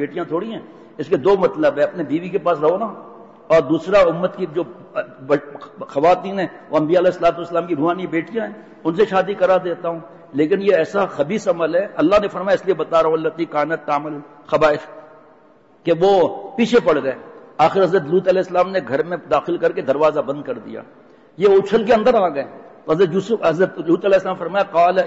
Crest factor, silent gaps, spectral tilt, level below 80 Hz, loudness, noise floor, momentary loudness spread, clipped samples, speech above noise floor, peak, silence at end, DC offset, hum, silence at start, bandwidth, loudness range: 14 dB; none; -6.5 dB/octave; -54 dBFS; -18 LUFS; -51 dBFS; 13 LU; under 0.1%; 33 dB; -4 dBFS; 0 s; under 0.1%; none; 0 s; 8 kHz; 3 LU